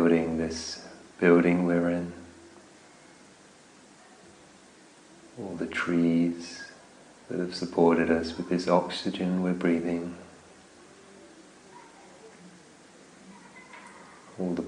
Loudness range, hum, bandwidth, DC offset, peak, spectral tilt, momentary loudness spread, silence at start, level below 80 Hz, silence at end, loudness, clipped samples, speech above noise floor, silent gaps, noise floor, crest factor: 20 LU; none; 10.5 kHz; under 0.1%; -8 dBFS; -6.5 dB/octave; 26 LU; 0 s; -60 dBFS; 0 s; -27 LUFS; under 0.1%; 29 dB; none; -54 dBFS; 22 dB